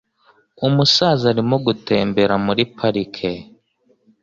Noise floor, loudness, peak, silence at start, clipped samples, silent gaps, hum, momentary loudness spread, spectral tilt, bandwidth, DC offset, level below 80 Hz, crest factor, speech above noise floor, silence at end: -61 dBFS; -17 LUFS; -2 dBFS; 0.6 s; under 0.1%; none; none; 11 LU; -5.5 dB/octave; 7.6 kHz; under 0.1%; -52 dBFS; 16 dB; 43 dB; 0.8 s